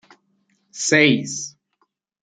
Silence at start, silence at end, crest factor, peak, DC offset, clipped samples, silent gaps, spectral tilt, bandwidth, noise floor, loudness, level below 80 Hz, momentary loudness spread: 0.75 s; 0.75 s; 22 dB; -2 dBFS; under 0.1%; under 0.1%; none; -3.5 dB/octave; 9.6 kHz; -69 dBFS; -18 LUFS; -68 dBFS; 19 LU